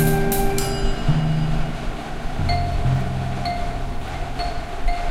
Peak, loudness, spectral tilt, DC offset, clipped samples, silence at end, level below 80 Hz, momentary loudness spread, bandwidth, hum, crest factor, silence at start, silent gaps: -6 dBFS; -24 LUFS; -5.5 dB/octave; under 0.1%; under 0.1%; 0 s; -24 dBFS; 9 LU; 16 kHz; none; 14 dB; 0 s; none